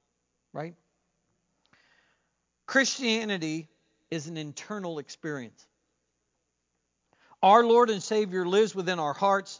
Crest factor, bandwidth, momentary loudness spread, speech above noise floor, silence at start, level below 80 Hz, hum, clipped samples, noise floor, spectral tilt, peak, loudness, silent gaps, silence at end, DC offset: 22 dB; 7.6 kHz; 19 LU; 53 dB; 0.55 s; -84 dBFS; 60 Hz at -70 dBFS; under 0.1%; -79 dBFS; -4 dB/octave; -6 dBFS; -26 LUFS; none; 0.05 s; under 0.1%